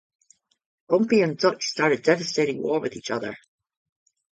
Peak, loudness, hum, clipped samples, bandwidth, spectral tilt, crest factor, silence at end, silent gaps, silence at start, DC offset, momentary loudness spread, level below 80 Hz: -4 dBFS; -23 LUFS; none; under 0.1%; 9.2 kHz; -4.5 dB/octave; 20 dB; 0.95 s; none; 0.9 s; under 0.1%; 10 LU; -68 dBFS